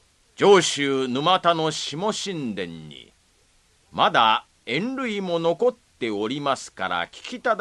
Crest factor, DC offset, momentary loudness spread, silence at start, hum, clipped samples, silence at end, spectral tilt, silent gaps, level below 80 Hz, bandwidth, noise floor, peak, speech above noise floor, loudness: 20 dB; under 0.1%; 14 LU; 0.4 s; none; under 0.1%; 0 s; -3.5 dB/octave; none; -64 dBFS; 11.5 kHz; -61 dBFS; -4 dBFS; 38 dB; -23 LUFS